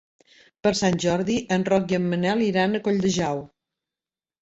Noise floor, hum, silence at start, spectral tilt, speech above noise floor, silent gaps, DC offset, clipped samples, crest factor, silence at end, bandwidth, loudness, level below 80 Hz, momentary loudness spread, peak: under -90 dBFS; none; 0.65 s; -5.5 dB/octave; over 68 dB; none; under 0.1%; under 0.1%; 16 dB; 0.95 s; 8 kHz; -23 LUFS; -56 dBFS; 4 LU; -8 dBFS